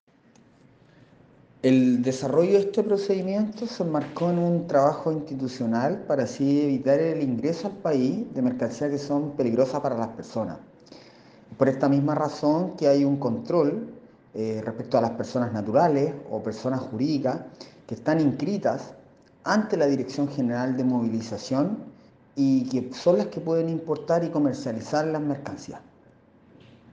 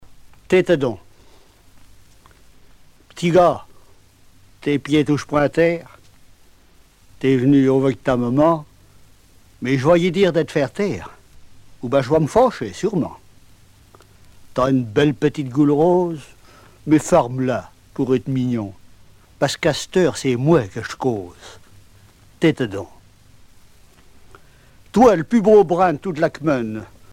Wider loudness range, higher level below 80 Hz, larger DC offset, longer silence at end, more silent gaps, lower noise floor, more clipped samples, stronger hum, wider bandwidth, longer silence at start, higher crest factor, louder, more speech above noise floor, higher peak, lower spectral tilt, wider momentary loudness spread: about the same, 3 LU vs 5 LU; second, -66 dBFS vs -48 dBFS; neither; first, 1.1 s vs 0.25 s; neither; first, -57 dBFS vs -51 dBFS; neither; neither; second, 8.2 kHz vs 15.5 kHz; first, 1.65 s vs 0.05 s; about the same, 20 dB vs 18 dB; second, -25 LUFS vs -18 LUFS; about the same, 33 dB vs 33 dB; second, -6 dBFS vs -2 dBFS; about the same, -7 dB/octave vs -6.5 dB/octave; second, 10 LU vs 14 LU